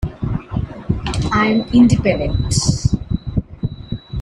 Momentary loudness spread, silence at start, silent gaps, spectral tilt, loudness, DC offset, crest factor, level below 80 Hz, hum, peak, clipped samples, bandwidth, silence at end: 14 LU; 0 s; none; -6 dB/octave; -18 LUFS; under 0.1%; 16 dB; -28 dBFS; none; 0 dBFS; under 0.1%; 11.5 kHz; 0 s